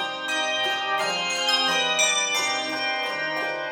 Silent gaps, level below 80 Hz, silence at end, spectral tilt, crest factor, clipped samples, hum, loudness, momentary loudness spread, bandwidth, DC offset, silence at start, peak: none; -72 dBFS; 0 s; 0 dB/octave; 16 dB; under 0.1%; none; -22 LUFS; 6 LU; 19.5 kHz; under 0.1%; 0 s; -8 dBFS